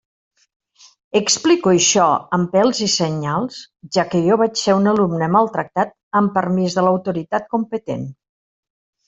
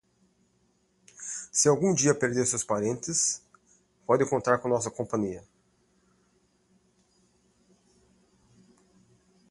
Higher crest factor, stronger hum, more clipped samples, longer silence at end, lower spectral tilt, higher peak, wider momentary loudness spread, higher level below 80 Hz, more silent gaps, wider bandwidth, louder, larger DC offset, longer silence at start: second, 16 dB vs 24 dB; neither; neither; second, 0.95 s vs 4.1 s; about the same, -4.5 dB/octave vs -4 dB/octave; first, -2 dBFS vs -8 dBFS; second, 9 LU vs 14 LU; first, -58 dBFS vs -66 dBFS; first, 6.03-6.11 s vs none; second, 8.2 kHz vs 11.5 kHz; first, -17 LUFS vs -26 LUFS; neither; about the same, 1.15 s vs 1.2 s